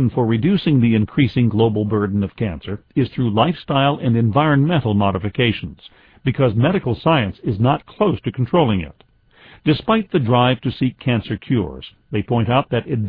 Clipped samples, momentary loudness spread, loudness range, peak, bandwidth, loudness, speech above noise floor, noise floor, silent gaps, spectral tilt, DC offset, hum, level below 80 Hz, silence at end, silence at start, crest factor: under 0.1%; 9 LU; 2 LU; -2 dBFS; 5 kHz; -18 LUFS; 30 dB; -48 dBFS; none; -10.5 dB/octave; under 0.1%; none; -44 dBFS; 0 s; 0 s; 16 dB